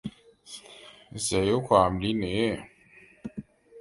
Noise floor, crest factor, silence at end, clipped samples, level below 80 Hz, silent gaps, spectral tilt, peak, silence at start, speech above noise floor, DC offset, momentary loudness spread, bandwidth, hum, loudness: -56 dBFS; 24 dB; 0 s; under 0.1%; -50 dBFS; none; -5 dB/octave; -6 dBFS; 0.05 s; 31 dB; under 0.1%; 22 LU; 11.5 kHz; none; -26 LUFS